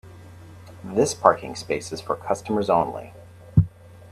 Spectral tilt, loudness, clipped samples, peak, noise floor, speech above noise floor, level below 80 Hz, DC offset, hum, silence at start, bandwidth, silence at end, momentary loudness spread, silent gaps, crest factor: -6 dB/octave; -23 LUFS; under 0.1%; 0 dBFS; -43 dBFS; 20 dB; -44 dBFS; under 0.1%; none; 0.05 s; 14 kHz; 0 s; 17 LU; none; 24 dB